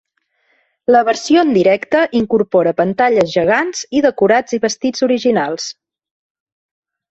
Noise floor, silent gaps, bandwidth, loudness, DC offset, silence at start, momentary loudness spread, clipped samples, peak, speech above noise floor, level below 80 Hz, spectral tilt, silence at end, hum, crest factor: -63 dBFS; none; 8.2 kHz; -14 LUFS; under 0.1%; 0.9 s; 6 LU; under 0.1%; 0 dBFS; 49 dB; -56 dBFS; -4.5 dB/octave; 1.4 s; none; 14 dB